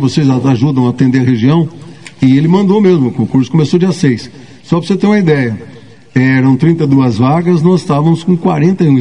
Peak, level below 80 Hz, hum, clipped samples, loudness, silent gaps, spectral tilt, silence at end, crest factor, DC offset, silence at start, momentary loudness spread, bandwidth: 0 dBFS; -48 dBFS; none; 0.4%; -10 LUFS; none; -8 dB/octave; 0 s; 10 dB; 0.9%; 0 s; 7 LU; 10 kHz